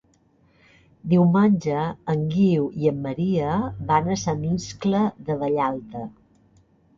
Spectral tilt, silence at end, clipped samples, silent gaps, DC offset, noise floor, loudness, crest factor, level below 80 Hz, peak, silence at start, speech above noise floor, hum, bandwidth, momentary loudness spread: -7.5 dB/octave; 0.85 s; under 0.1%; none; under 0.1%; -60 dBFS; -23 LUFS; 18 dB; -52 dBFS; -6 dBFS; 1.05 s; 39 dB; none; 7.4 kHz; 8 LU